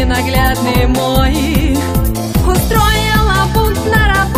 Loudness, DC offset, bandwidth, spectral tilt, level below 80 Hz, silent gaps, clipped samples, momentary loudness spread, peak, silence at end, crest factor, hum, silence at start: -13 LUFS; under 0.1%; 15.5 kHz; -5 dB/octave; -16 dBFS; none; under 0.1%; 3 LU; 0 dBFS; 0 s; 12 dB; none; 0 s